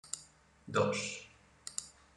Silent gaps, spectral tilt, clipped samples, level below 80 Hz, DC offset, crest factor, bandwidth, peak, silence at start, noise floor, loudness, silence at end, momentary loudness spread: none; -3.5 dB/octave; under 0.1%; -70 dBFS; under 0.1%; 22 dB; 12 kHz; -16 dBFS; 0.05 s; -61 dBFS; -37 LUFS; 0.25 s; 20 LU